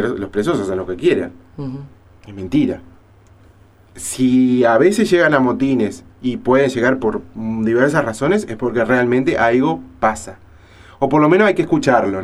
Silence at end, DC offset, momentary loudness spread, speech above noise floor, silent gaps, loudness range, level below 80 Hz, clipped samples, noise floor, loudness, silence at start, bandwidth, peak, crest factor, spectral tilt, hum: 0 s; under 0.1%; 15 LU; 31 dB; none; 7 LU; -46 dBFS; under 0.1%; -47 dBFS; -16 LUFS; 0 s; 14 kHz; 0 dBFS; 16 dB; -6 dB/octave; none